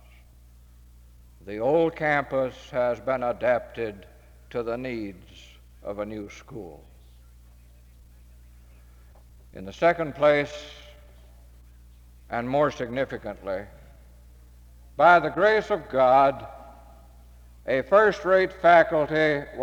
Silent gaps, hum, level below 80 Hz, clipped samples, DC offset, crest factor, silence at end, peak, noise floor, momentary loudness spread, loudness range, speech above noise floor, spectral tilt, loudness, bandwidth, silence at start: none; 60 Hz at -50 dBFS; -50 dBFS; under 0.1%; under 0.1%; 20 dB; 0 s; -6 dBFS; -52 dBFS; 22 LU; 14 LU; 28 dB; -6 dB/octave; -23 LUFS; 14 kHz; 1.45 s